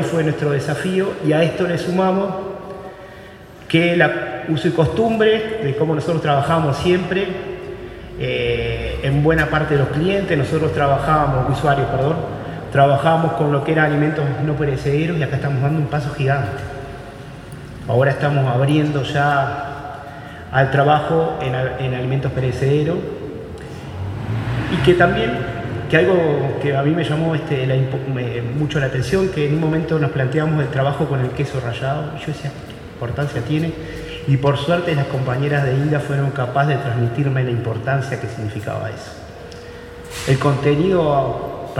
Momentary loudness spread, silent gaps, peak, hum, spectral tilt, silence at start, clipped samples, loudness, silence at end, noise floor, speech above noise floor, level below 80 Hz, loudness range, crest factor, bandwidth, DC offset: 15 LU; none; 0 dBFS; none; -7 dB/octave; 0 s; under 0.1%; -19 LUFS; 0 s; -38 dBFS; 21 dB; -40 dBFS; 4 LU; 18 dB; 12 kHz; under 0.1%